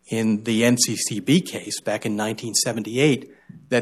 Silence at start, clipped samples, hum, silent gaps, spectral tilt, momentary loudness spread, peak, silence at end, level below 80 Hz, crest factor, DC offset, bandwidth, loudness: 0.1 s; under 0.1%; none; none; -4 dB/octave; 7 LU; -4 dBFS; 0 s; -66 dBFS; 18 dB; under 0.1%; 14 kHz; -22 LUFS